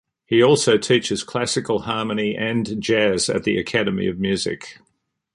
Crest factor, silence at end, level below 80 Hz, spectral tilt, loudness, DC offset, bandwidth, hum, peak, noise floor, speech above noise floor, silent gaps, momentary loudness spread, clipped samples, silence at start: 18 dB; 0.6 s; -52 dBFS; -4 dB/octave; -20 LUFS; under 0.1%; 11.5 kHz; none; -4 dBFS; -70 dBFS; 51 dB; none; 8 LU; under 0.1%; 0.3 s